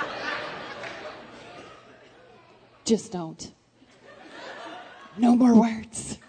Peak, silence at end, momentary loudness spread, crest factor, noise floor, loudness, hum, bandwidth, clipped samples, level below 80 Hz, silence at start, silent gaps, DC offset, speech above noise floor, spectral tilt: -8 dBFS; 0.1 s; 25 LU; 20 dB; -55 dBFS; -24 LUFS; none; 9.4 kHz; under 0.1%; -64 dBFS; 0 s; none; under 0.1%; 33 dB; -5 dB/octave